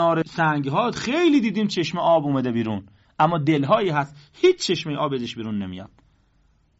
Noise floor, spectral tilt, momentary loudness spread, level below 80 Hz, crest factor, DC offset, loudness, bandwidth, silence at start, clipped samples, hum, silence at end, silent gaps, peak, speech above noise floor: -61 dBFS; -4.5 dB/octave; 10 LU; -58 dBFS; 16 dB; under 0.1%; -22 LUFS; 8 kHz; 0 s; under 0.1%; none; 0.95 s; none; -6 dBFS; 40 dB